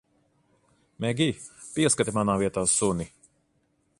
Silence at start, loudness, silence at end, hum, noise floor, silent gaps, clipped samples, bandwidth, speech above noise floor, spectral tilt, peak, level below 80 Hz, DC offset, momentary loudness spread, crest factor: 1 s; -25 LUFS; 0.9 s; none; -70 dBFS; none; under 0.1%; 11.5 kHz; 45 dB; -4 dB/octave; -8 dBFS; -54 dBFS; under 0.1%; 12 LU; 20 dB